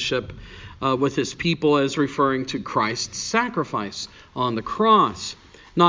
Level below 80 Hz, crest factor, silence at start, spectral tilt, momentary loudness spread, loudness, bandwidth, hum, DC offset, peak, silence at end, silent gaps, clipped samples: -50 dBFS; 20 dB; 0 s; -4.5 dB/octave; 15 LU; -22 LUFS; 7.6 kHz; none; under 0.1%; -2 dBFS; 0 s; none; under 0.1%